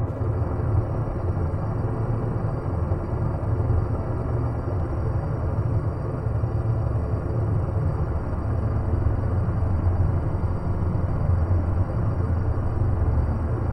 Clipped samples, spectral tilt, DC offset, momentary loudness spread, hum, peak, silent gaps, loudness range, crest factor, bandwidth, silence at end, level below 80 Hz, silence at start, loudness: under 0.1%; -11 dB/octave; under 0.1%; 3 LU; none; -10 dBFS; none; 2 LU; 12 dB; 5 kHz; 0 s; -30 dBFS; 0 s; -25 LUFS